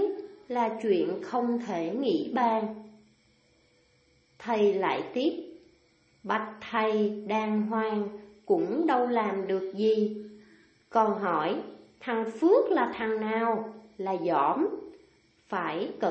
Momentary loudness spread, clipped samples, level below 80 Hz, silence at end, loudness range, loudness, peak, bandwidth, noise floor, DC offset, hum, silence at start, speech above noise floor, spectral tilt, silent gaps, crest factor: 14 LU; under 0.1%; -74 dBFS; 0 s; 4 LU; -28 LUFS; -10 dBFS; 8.2 kHz; -66 dBFS; under 0.1%; none; 0 s; 38 dB; -7 dB/octave; none; 18 dB